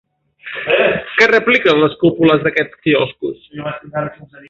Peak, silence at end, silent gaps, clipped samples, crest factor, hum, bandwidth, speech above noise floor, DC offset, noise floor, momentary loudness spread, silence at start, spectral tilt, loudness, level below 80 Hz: 0 dBFS; 0.25 s; none; under 0.1%; 16 dB; none; 7.6 kHz; 20 dB; under 0.1%; -35 dBFS; 15 LU; 0.45 s; -6 dB/octave; -14 LUFS; -54 dBFS